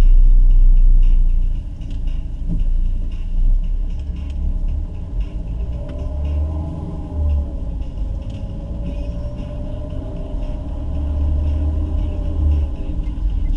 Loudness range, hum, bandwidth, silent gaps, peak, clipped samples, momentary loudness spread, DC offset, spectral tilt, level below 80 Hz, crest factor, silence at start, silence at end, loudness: 4 LU; none; 3.2 kHz; none; -4 dBFS; under 0.1%; 11 LU; under 0.1%; -9.5 dB/octave; -16 dBFS; 12 dB; 0 s; 0 s; -23 LUFS